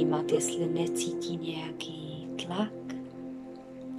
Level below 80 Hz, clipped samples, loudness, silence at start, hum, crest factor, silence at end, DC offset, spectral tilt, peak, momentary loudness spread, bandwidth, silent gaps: -72 dBFS; under 0.1%; -33 LUFS; 0 s; none; 20 dB; 0 s; under 0.1%; -4.5 dB/octave; -14 dBFS; 14 LU; 15.5 kHz; none